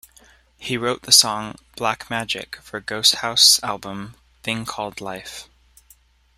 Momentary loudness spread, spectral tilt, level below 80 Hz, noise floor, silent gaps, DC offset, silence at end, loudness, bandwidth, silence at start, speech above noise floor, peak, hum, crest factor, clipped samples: 22 LU; -1 dB/octave; -56 dBFS; -55 dBFS; none; under 0.1%; 0.95 s; -18 LUFS; 16 kHz; 0.6 s; 34 dB; 0 dBFS; none; 22 dB; under 0.1%